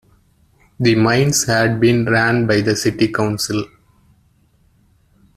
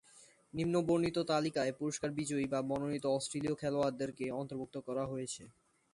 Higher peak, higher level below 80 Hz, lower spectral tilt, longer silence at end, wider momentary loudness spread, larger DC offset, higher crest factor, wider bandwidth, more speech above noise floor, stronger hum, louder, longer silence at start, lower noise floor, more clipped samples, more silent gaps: first, -2 dBFS vs -20 dBFS; first, -48 dBFS vs -68 dBFS; about the same, -4.5 dB/octave vs -5.5 dB/octave; first, 1.7 s vs 0.45 s; about the same, 7 LU vs 9 LU; neither; about the same, 16 dB vs 16 dB; first, 14 kHz vs 11.5 kHz; first, 41 dB vs 27 dB; neither; first, -16 LUFS vs -36 LUFS; first, 0.8 s vs 0.15 s; second, -56 dBFS vs -63 dBFS; neither; neither